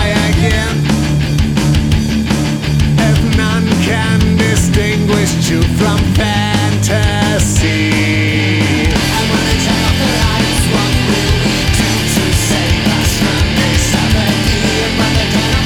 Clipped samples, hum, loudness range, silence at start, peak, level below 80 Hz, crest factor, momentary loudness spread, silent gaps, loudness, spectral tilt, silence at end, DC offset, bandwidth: under 0.1%; none; 0 LU; 0 s; 0 dBFS; -22 dBFS; 12 dB; 1 LU; none; -12 LUFS; -4.5 dB/octave; 0 s; under 0.1%; 19.5 kHz